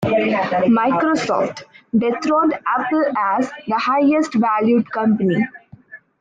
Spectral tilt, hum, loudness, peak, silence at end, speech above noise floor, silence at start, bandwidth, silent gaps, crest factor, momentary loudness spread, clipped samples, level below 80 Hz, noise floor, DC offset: -6.5 dB/octave; none; -18 LUFS; -6 dBFS; 0.25 s; 25 dB; 0 s; 7.8 kHz; none; 12 dB; 6 LU; under 0.1%; -60 dBFS; -43 dBFS; under 0.1%